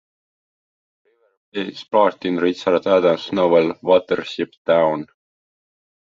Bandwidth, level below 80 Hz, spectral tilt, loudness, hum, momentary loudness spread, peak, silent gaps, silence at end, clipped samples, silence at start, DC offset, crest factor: 7.4 kHz; -66 dBFS; -6.5 dB/octave; -19 LUFS; none; 12 LU; -2 dBFS; 4.57-4.65 s; 1.1 s; under 0.1%; 1.55 s; under 0.1%; 18 dB